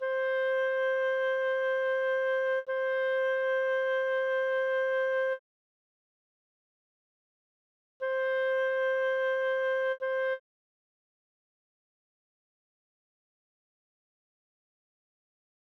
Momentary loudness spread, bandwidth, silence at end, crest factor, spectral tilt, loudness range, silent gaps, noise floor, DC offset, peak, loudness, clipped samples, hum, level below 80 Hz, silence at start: 2 LU; 6.2 kHz; 5.25 s; 10 dB; 0 dB/octave; 9 LU; 5.39-8.00 s; under -90 dBFS; under 0.1%; -22 dBFS; -29 LUFS; under 0.1%; none; -82 dBFS; 0 s